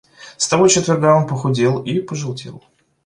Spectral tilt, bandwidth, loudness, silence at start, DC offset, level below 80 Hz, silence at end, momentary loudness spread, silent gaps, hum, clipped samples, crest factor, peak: -4.5 dB/octave; 11.5 kHz; -16 LUFS; 0.2 s; under 0.1%; -54 dBFS; 0.45 s; 14 LU; none; none; under 0.1%; 16 dB; -2 dBFS